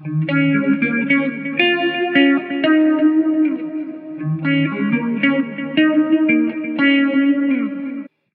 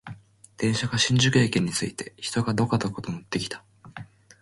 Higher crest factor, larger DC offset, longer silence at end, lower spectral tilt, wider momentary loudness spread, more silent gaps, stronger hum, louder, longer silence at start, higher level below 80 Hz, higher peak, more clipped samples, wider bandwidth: about the same, 16 dB vs 18 dB; neither; about the same, 0.25 s vs 0.35 s; first, -10 dB/octave vs -4.5 dB/octave; second, 10 LU vs 23 LU; neither; neither; first, -17 LUFS vs -25 LUFS; about the same, 0 s vs 0.05 s; second, -68 dBFS vs -54 dBFS; first, -2 dBFS vs -8 dBFS; neither; second, 4.5 kHz vs 11.5 kHz